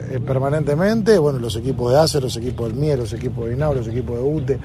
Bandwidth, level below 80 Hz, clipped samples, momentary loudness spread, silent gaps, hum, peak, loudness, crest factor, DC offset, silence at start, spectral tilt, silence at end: 15 kHz; -38 dBFS; under 0.1%; 9 LU; none; none; -2 dBFS; -19 LUFS; 16 dB; under 0.1%; 0 s; -6.5 dB/octave; 0 s